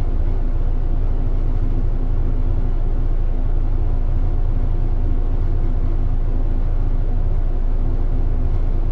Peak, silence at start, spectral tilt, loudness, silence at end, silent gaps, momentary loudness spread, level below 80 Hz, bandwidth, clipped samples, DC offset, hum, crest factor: -8 dBFS; 0 s; -10 dB/octave; -24 LUFS; 0 s; none; 1 LU; -16 dBFS; 2.3 kHz; under 0.1%; under 0.1%; none; 8 dB